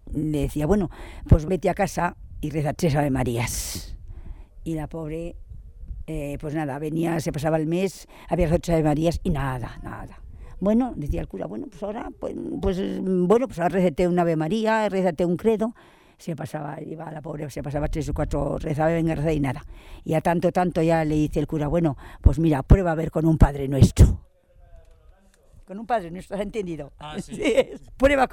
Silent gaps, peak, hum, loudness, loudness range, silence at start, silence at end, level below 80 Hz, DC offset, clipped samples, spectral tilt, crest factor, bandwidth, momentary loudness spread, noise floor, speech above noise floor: none; -2 dBFS; none; -24 LUFS; 8 LU; 0.05 s; 0 s; -32 dBFS; under 0.1%; under 0.1%; -7 dB/octave; 22 dB; 17.5 kHz; 15 LU; -54 dBFS; 31 dB